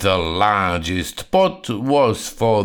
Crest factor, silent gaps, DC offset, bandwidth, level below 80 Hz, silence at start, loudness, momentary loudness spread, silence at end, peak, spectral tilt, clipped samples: 16 dB; none; under 0.1%; 19.5 kHz; -40 dBFS; 0 s; -19 LUFS; 6 LU; 0 s; -2 dBFS; -5 dB/octave; under 0.1%